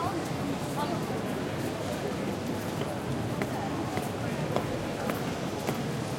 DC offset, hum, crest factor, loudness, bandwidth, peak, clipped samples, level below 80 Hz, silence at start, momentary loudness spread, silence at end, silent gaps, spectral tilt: under 0.1%; none; 22 dB; -32 LUFS; 16.5 kHz; -10 dBFS; under 0.1%; -54 dBFS; 0 s; 2 LU; 0 s; none; -5.5 dB/octave